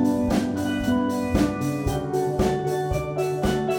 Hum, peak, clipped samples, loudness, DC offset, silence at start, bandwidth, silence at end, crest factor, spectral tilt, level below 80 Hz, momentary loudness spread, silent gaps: none; -8 dBFS; under 0.1%; -24 LUFS; under 0.1%; 0 s; 19 kHz; 0 s; 16 dB; -6.5 dB/octave; -38 dBFS; 3 LU; none